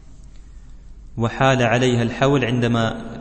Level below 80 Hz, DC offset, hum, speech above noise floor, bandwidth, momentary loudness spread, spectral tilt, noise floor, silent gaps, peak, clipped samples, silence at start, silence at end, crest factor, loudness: -40 dBFS; under 0.1%; none; 21 dB; 8.6 kHz; 8 LU; -6 dB/octave; -40 dBFS; none; -4 dBFS; under 0.1%; 0.1 s; 0 s; 16 dB; -19 LUFS